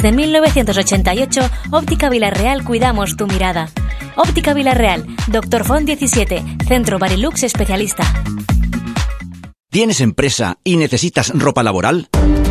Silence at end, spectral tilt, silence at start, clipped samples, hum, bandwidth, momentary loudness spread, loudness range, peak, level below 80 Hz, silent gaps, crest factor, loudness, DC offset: 0 s; -4.5 dB/octave; 0 s; under 0.1%; none; 15 kHz; 7 LU; 2 LU; 0 dBFS; -22 dBFS; none; 14 dB; -15 LUFS; under 0.1%